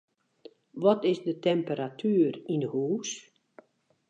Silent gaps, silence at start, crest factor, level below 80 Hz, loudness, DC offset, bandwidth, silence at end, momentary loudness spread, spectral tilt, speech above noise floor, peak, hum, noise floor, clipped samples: none; 0.75 s; 18 dB; -82 dBFS; -28 LUFS; under 0.1%; 8.6 kHz; 0.9 s; 10 LU; -6 dB/octave; 35 dB; -10 dBFS; none; -63 dBFS; under 0.1%